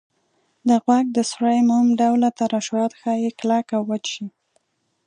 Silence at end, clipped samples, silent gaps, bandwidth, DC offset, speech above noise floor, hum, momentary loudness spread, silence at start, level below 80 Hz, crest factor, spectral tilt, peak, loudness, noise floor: 0.8 s; under 0.1%; none; 10 kHz; under 0.1%; 48 dB; none; 9 LU; 0.65 s; -72 dBFS; 16 dB; -5 dB/octave; -4 dBFS; -20 LUFS; -67 dBFS